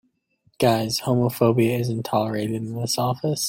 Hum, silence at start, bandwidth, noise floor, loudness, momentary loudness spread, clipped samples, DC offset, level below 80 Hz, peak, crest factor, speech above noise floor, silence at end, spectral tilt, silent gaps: none; 0.6 s; 16.5 kHz; -65 dBFS; -22 LUFS; 6 LU; under 0.1%; under 0.1%; -58 dBFS; -4 dBFS; 18 dB; 43 dB; 0 s; -5.5 dB/octave; none